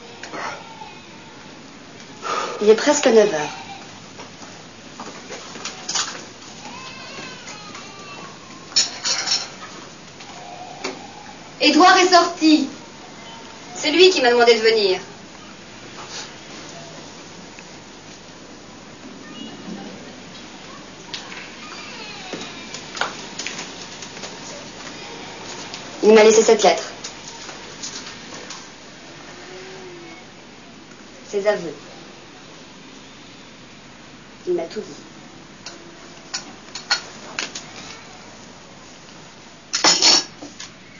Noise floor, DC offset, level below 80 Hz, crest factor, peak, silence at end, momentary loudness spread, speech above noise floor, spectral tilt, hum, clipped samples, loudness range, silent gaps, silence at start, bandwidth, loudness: -43 dBFS; 0.2%; -62 dBFS; 22 dB; 0 dBFS; 0.3 s; 26 LU; 28 dB; -2 dB/octave; none; under 0.1%; 18 LU; none; 0 s; 7.4 kHz; -18 LUFS